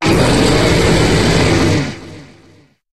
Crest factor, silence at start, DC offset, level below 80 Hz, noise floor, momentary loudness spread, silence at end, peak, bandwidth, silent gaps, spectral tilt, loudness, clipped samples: 12 dB; 0 s; under 0.1%; -26 dBFS; -47 dBFS; 7 LU; 0 s; 0 dBFS; 14 kHz; none; -5 dB/octave; -12 LUFS; under 0.1%